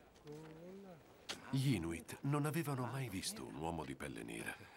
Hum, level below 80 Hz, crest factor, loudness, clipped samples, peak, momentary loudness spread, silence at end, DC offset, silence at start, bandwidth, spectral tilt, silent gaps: none; -66 dBFS; 18 dB; -42 LUFS; under 0.1%; -26 dBFS; 17 LU; 0 s; under 0.1%; 0 s; 16 kHz; -5.5 dB/octave; none